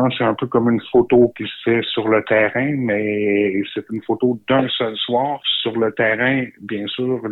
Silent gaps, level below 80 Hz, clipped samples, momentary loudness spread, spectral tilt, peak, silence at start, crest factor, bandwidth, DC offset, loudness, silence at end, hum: none; -56 dBFS; under 0.1%; 8 LU; -8.5 dB/octave; -4 dBFS; 0 s; 14 dB; 4.1 kHz; under 0.1%; -18 LUFS; 0 s; none